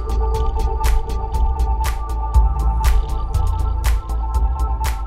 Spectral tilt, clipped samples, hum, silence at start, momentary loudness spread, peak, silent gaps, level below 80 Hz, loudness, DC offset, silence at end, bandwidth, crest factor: -5.5 dB/octave; under 0.1%; none; 0 s; 5 LU; -4 dBFS; none; -18 dBFS; -21 LUFS; under 0.1%; 0 s; 15 kHz; 14 dB